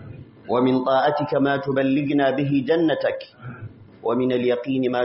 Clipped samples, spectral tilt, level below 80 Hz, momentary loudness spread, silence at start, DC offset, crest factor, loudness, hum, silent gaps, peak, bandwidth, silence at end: under 0.1%; -5 dB/octave; -60 dBFS; 18 LU; 0 s; under 0.1%; 14 dB; -21 LUFS; none; none; -8 dBFS; 5.8 kHz; 0 s